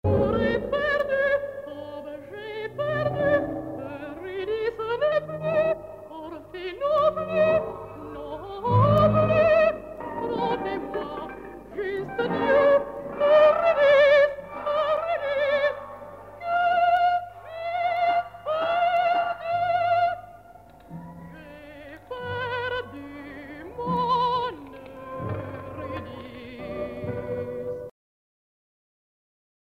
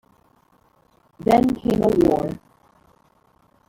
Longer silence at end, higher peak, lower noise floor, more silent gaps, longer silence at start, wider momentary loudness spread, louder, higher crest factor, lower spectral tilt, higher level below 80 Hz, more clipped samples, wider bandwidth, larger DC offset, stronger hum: first, 1.85 s vs 1.35 s; second, -8 dBFS vs -4 dBFS; second, -49 dBFS vs -60 dBFS; neither; second, 0.05 s vs 1.25 s; first, 20 LU vs 11 LU; second, -24 LUFS vs -20 LUFS; about the same, 18 dB vs 20 dB; about the same, -7.5 dB/octave vs -7.5 dB/octave; about the same, -50 dBFS vs -46 dBFS; neither; second, 6.6 kHz vs 17 kHz; neither; neither